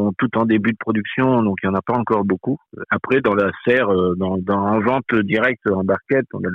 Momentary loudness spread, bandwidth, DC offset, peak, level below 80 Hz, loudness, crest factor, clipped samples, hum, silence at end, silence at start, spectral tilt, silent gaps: 5 LU; 5 kHz; under 0.1%; -6 dBFS; -56 dBFS; -19 LUFS; 14 dB; under 0.1%; none; 0 s; 0 s; -9 dB/octave; none